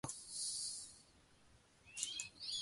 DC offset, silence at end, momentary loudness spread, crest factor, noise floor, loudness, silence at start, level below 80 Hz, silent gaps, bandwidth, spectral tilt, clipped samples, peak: under 0.1%; 0 s; 13 LU; 28 dB; -69 dBFS; -44 LUFS; 0.05 s; -76 dBFS; none; 16 kHz; 0 dB/octave; under 0.1%; -20 dBFS